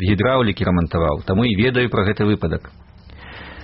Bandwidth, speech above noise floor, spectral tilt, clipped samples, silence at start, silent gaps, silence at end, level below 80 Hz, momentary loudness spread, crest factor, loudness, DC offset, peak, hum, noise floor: 5.6 kHz; 22 dB; -5.5 dB/octave; under 0.1%; 0 s; none; 0 s; -36 dBFS; 13 LU; 14 dB; -18 LUFS; under 0.1%; -6 dBFS; none; -39 dBFS